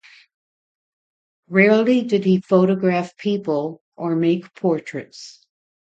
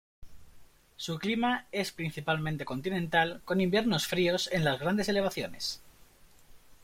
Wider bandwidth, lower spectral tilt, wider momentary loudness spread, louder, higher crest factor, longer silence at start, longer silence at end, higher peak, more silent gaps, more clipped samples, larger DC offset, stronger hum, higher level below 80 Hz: second, 8 kHz vs 16.5 kHz; first, -7.5 dB/octave vs -5 dB/octave; first, 17 LU vs 8 LU; first, -19 LUFS vs -30 LUFS; about the same, 20 dB vs 20 dB; first, 1.5 s vs 0.2 s; first, 0.5 s vs 0.1 s; first, 0 dBFS vs -12 dBFS; first, 3.81-3.92 s vs none; neither; neither; neither; second, -68 dBFS vs -58 dBFS